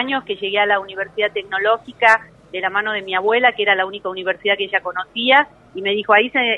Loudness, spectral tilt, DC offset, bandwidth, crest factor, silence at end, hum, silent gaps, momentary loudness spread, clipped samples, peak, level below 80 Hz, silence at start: -18 LUFS; -4 dB/octave; under 0.1%; 10.5 kHz; 18 dB; 0 s; none; none; 10 LU; under 0.1%; 0 dBFS; -62 dBFS; 0 s